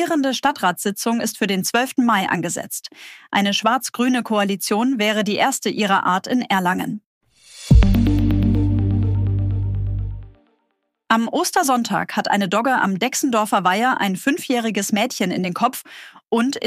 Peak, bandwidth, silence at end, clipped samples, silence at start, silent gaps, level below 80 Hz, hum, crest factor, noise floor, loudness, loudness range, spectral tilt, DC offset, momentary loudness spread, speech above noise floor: -2 dBFS; 15.5 kHz; 0 s; under 0.1%; 0 s; 7.06-7.21 s; -30 dBFS; none; 18 dB; -71 dBFS; -19 LUFS; 3 LU; -5 dB/octave; under 0.1%; 7 LU; 52 dB